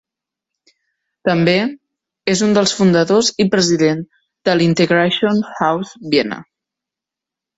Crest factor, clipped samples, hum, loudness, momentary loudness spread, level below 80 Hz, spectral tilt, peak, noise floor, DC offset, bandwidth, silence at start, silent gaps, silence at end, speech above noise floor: 16 dB; under 0.1%; none; -15 LUFS; 11 LU; -56 dBFS; -4.5 dB/octave; -2 dBFS; -86 dBFS; under 0.1%; 8 kHz; 1.25 s; none; 1.15 s; 71 dB